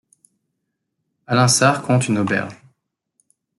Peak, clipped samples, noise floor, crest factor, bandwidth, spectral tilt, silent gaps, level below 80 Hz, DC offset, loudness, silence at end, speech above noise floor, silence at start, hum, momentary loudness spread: -2 dBFS; under 0.1%; -76 dBFS; 18 dB; 12 kHz; -4.5 dB/octave; none; -60 dBFS; under 0.1%; -17 LUFS; 1.05 s; 59 dB; 1.3 s; none; 9 LU